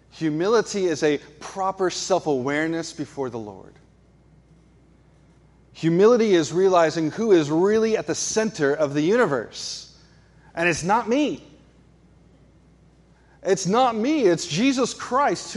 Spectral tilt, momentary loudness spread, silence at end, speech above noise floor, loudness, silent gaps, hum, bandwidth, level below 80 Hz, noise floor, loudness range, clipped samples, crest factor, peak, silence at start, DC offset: -4.5 dB/octave; 13 LU; 0 s; 33 dB; -22 LUFS; none; none; 11.5 kHz; -58 dBFS; -55 dBFS; 7 LU; under 0.1%; 16 dB; -6 dBFS; 0.15 s; under 0.1%